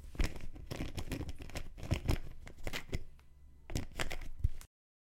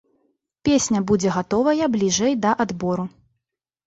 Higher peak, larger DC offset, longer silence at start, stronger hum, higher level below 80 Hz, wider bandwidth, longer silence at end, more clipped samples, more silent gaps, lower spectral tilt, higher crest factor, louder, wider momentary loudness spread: second, -16 dBFS vs -6 dBFS; neither; second, 0 s vs 0.65 s; neither; first, -42 dBFS vs -52 dBFS; first, 16.5 kHz vs 8.2 kHz; second, 0.55 s vs 0.8 s; neither; neither; about the same, -5 dB/octave vs -4.5 dB/octave; first, 22 dB vs 16 dB; second, -42 LUFS vs -21 LUFS; first, 14 LU vs 7 LU